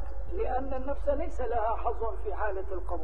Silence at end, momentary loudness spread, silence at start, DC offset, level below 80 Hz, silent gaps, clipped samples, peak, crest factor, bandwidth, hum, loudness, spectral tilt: 0 s; 5 LU; 0 s; 4%; -38 dBFS; none; under 0.1%; -16 dBFS; 14 dB; 7.2 kHz; none; -33 LUFS; -8.5 dB/octave